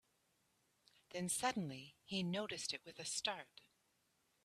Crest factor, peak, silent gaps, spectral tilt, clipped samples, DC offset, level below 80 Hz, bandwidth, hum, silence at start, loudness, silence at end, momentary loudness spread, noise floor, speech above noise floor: 22 dB; -24 dBFS; none; -3 dB/octave; under 0.1%; under 0.1%; -82 dBFS; 14.5 kHz; none; 1.1 s; -43 LUFS; 1 s; 12 LU; -81 dBFS; 37 dB